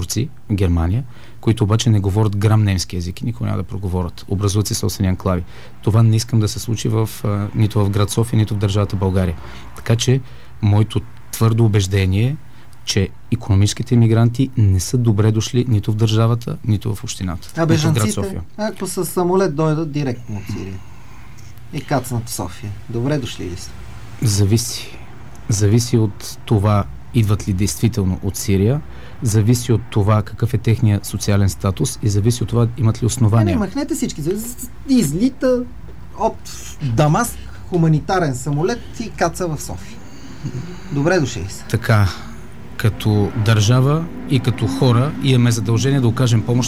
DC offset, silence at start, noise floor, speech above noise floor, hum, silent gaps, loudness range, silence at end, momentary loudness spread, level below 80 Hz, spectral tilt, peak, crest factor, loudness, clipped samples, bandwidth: 2%; 0 s; -39 dBFS; 22 dB; none; none; 5 LU; 0 s; 13 LU; -38 dBFS; -6 dB/octave; -2 dBFS; 16 dB; -18 LUFS; under 0.1%; 15 kHz